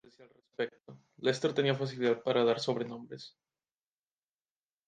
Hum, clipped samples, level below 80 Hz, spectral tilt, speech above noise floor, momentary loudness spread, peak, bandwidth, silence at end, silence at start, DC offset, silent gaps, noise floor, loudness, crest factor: none; under 0.1%; -80 dBFS; -5.5 dB/octave; over 58 dB; 19 LU; -14 dBFS; 9.4 kHz; 1.6 s; 0.2 s; under 0.1%; none; under -90 dBFS; -32 LUFS; 22 dB